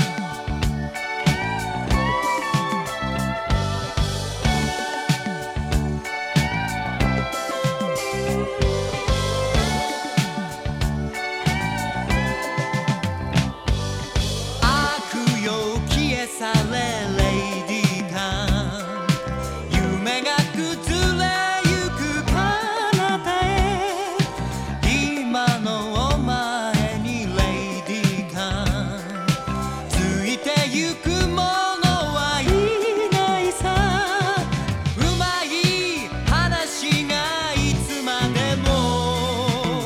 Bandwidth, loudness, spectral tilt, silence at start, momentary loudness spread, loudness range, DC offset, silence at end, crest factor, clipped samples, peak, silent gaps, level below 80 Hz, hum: 16.5 kHz; -22 LUFS; -4.5 dB/octave; 0 s; 5 LU; 3 LU; under 0.1%; 0 s; 18 dB; under 0.1%; -4 dBFS; none; -32 dBFS; none